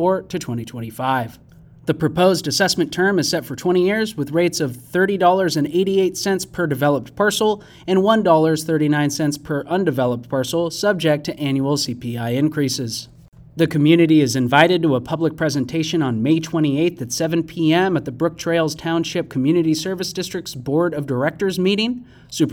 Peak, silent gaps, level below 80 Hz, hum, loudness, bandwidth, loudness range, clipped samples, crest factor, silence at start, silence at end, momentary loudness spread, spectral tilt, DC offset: 0 dBFS; 13.28-13.32 s; -54 dBFS; none; -19 LUFS; 18 kHz; 3 LU; under 0.1%; 18 dB; 0 s; 0 s; 9 LU; -5 dB/octave; under 0.1%